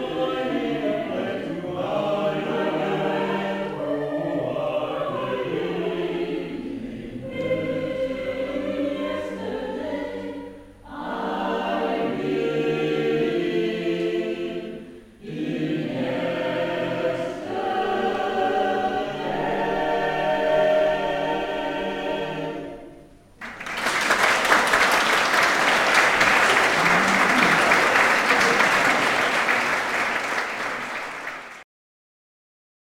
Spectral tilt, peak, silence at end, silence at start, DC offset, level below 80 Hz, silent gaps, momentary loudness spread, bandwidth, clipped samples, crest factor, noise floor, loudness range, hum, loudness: -3.5 dB/octave; -2 dBFS; 1.3 s; 0 s; under 0.1%; -54 dBFS; none; 14 LU; 16.5 kHz; under 0.1%; 22 dB; -47 dBFS; 10 LU; none; -22 LUFS